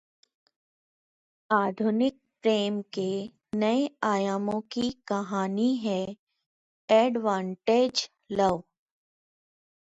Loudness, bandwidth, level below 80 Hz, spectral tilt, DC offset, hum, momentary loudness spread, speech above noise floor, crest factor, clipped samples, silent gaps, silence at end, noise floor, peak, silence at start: -27 LUFS; 8 kHz; -68 dBFS; -5.5 dB/octave; under 0.1%; none; 8 LU; over 64 dB; 20 dB; under 0.1%; 6.19-6.27 s, 6.46-6.88 s; 1.2 s; under -90 dBFS; -8 dBFS; 1.5 s